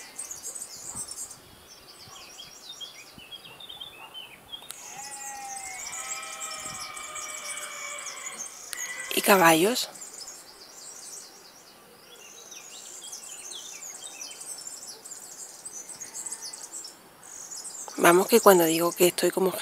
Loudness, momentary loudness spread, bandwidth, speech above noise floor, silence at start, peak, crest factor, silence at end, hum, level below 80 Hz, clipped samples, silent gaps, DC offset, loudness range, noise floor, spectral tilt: -27 LUFS; 23 LU; 16 kHz; 31 dB; 0 s; 0 dBFS; 28 dB; 0 s; none; -70 dBFS; under 0.1%; none; under 0.1%; 17 LU; -52 dBFS; -3 dB/octave